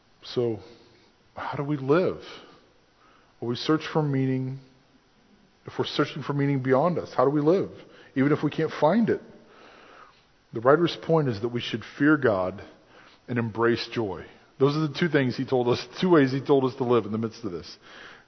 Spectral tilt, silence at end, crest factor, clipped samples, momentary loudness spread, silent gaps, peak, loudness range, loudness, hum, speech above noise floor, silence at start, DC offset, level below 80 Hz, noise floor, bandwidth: -7.5 dB/octave; 0.15 s; 22 dB; under 0.1%; 15 LU; none; -4 dBFS; 6 LU; -25 LUFS; none; 36 dB; 0.25 s; under 0.1%; -62 dBFS; -60 dBFS; 6.4 kHz